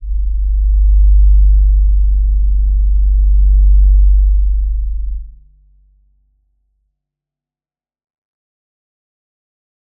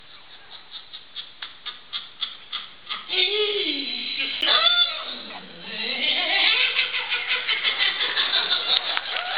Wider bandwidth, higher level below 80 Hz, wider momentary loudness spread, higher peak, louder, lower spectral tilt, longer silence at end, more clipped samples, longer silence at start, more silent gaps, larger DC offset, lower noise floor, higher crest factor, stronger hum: second, 0.2 kHz vs 6.6 kHz; first, -12 dBFS vs -70 dBFS; second, 9 LU vs 19 LU; about the same, -2 dBFS vs -2 dBFS; first, -14 LUFS vs -21 LUFS; first, -17 dB/octave vs -3 dB/octave; first, 4.7 s vs 0 s; neither; about the same, 0 s vs 0.1 s; neither; second, under 0.1% vs 0.4%; first, under -90 dBFS vs -47 dBFS; second, 10 dB vs 24 dB; neither